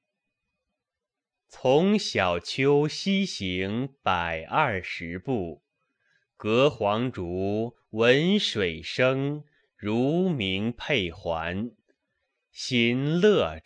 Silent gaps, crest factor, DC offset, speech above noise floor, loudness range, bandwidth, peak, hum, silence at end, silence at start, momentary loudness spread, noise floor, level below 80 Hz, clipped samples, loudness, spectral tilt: none; 20 dB; under 0.1%; 63 dB; 4 LU; 10 kHz; -8 dBFS; none; 0.05 s; 1.55 s; 10 LU; -88 dBFS; -56 dBFS; under 0.1%; -26 LUFS; -5.5 dB/octave